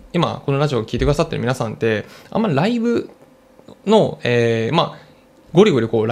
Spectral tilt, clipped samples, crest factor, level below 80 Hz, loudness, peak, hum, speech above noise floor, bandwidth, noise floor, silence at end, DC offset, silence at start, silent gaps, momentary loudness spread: -6.5 dB/octave; under 0.1%; 16 dB; -38 dBFS; -18 LUFS; -2 dBFS; none; 31 dB; 13.5 kHz; -48 dBFS; 0 s; under 0.1%; 0.05 s; none; 9 LU